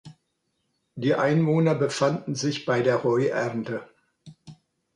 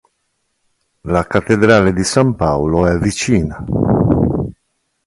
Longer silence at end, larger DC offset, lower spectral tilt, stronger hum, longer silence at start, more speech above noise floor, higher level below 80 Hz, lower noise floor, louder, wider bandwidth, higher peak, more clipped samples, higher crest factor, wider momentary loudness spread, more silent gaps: second, 0.4 s vs 0.55 s; neither; about the same, -6 dB/octave vs -6 dB/octave; neither; second, 0.05 s vs 1.05 s; about the same, 52 dB vs 54 dB; second, -68 dBFS vs -32 dBFS; first, -75 dBFS vs -68 dBFS; second, -24 LUFS vs -14 LUFS; about the same, 11 kHz vs 11.5 kHz; second, -8 dBFS vs 0 dBFS; neither; about the same, 18 dB vs 16 dB; about the same, 10 LU vs 8 LU; neither